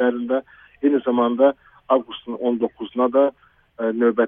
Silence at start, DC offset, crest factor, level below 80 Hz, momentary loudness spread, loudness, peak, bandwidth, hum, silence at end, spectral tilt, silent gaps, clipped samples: 0 s; under 0.1%; 18 dB; -64 dBFS; 8 LU; -21 LUFS; -4 dBFS; 3.7 kHz; none; 0 s; -9.5 dB/octave; none; under 0.1%